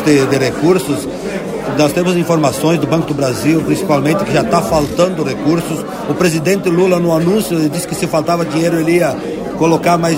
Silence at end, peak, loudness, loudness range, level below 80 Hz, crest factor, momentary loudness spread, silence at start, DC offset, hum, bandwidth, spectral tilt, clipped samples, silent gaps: 0 s; 0 dBFS; -14 LUFS; 1 LU; -42 dBFS; 14 dB; 7 LU; 0 s; under 0.1%; none; 16.5 kHz; -5.5 dB/octave; under 0.1%; none